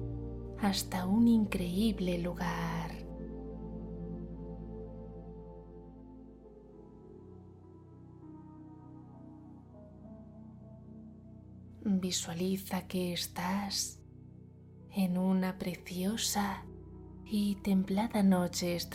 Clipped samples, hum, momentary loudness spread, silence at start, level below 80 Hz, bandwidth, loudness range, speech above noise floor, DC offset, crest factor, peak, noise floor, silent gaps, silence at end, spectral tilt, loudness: under 0.1%; none; 23 LU; 0 s; -52 dBFS; 16.5 kHz; 20 LU; 22 dB; under 0.1%; 20 dB; -16 dBFS; -54 dBFS; none; 0 s; -5 dB/octave; -34 LUFS